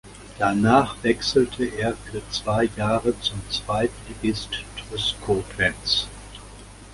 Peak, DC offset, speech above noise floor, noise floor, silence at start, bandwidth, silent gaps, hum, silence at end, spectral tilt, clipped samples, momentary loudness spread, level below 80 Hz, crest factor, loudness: -2 dBFS; under 0.1%; 19 dB; -42 dBFS; 0.05 s; 11.5 kHz; none; none; 0 s; -4.5 dB/octave; under 0.1%; 14 LU; -44 dBFS; 22 dB; -23 LUFS